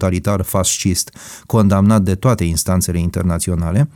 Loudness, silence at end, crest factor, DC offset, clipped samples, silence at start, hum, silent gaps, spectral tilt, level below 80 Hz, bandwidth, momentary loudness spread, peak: -16 LUFS; 0.05 s; 12 dB; under 0.1%; under 0.1%; 0 s; none; none; -5.5 dB/octave; -34 dBFS; 19 kHz; 6 LU; -4 dBFS